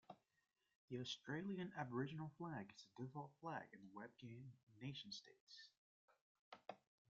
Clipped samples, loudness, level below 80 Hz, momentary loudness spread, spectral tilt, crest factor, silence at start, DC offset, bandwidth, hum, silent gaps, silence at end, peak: under 0.1%; -53 LUFS; -88 dBFS; 15 LU; -4.5 dB/octave; 22 dB; 0.1 s; under 0.1%; 7.4 kHz; none; 0.75-0.88 s, 4.63-4.67 s, 5.40-5.47 s, 5.78-6.08 s, 6.21-6.52 s; 0.3 s; -32 dBFS